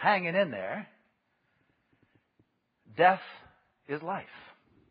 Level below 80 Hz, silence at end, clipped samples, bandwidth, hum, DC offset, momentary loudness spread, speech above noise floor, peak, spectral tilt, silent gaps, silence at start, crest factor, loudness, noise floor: -76 dBFS; 0.5 s; under 0.1%; 5 kHz; none; under 0.1%; 24 LU; 46 dB; -8 dBFS; -3 dB/octave; none; 0 s; 24 dB; -29 LUFS; -75 dBFS